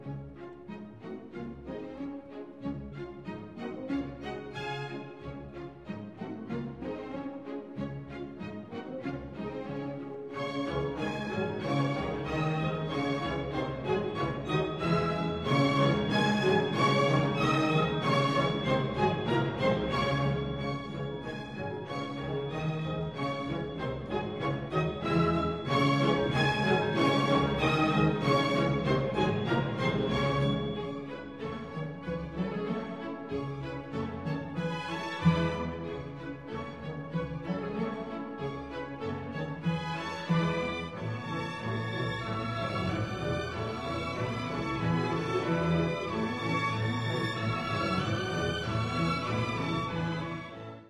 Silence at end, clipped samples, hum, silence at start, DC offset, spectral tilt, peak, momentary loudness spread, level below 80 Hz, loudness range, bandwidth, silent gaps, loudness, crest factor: 0 s; under 0.1%; none; 0 s; under 0.1%; -6.5 dB/octave; -12 dBFS; 14 LU; -52 dBFS; 12 LU; 12 kHz; none; -31 LUFS; 18 dB